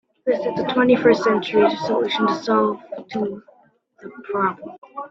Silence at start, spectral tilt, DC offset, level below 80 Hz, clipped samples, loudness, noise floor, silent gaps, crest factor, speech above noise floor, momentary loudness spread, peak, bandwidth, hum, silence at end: 0.25 s; -6 dB/octave; under 0.1%; -62 dBFS; under 0.1%; -20 LUFS; -56 dBFS; 4.78-4.82 s; 18 dB; 36 dB; 20 LU; -2 dBFS; 7.6 kHz; none; 0 s